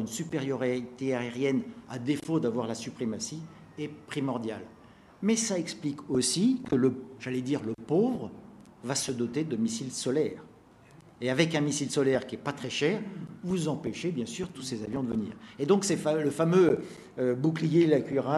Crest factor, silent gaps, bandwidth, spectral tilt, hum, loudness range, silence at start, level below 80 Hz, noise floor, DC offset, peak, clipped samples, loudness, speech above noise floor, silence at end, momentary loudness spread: 20 dB; none; 13 kHz; -5 dB/octave; none; 5 LU; 0 s; -66 dBFS; -55 dBFS; under 0.1%; -10 dBFS; under 0.1%; -29 LUFS; 26 dB; 0 s; 13 LU